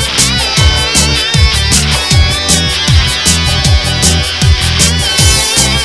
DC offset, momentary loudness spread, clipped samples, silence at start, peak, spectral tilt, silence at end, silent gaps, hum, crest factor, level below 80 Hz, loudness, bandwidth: 0.8%; 2 LU; 0.8%; 0 s; 0 dBFS; -2.5 dB/octave; 0 s; none; none; 10 dB; -16 dBFS; -8 LUFS; 11 kHz